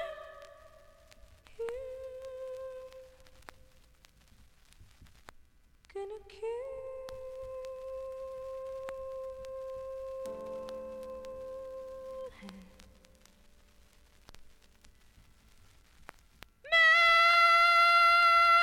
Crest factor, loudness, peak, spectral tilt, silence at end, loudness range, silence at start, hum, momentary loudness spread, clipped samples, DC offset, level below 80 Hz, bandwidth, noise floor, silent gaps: 18 dB; -24 LUFS; -14 dBFS; -1 dB/octave; 0 s; 25 LU; 0 s; none; 23 LU; under 0.1%; under 0.1%; -62 dBFS; 16.5 kHz; -62 dBFS; none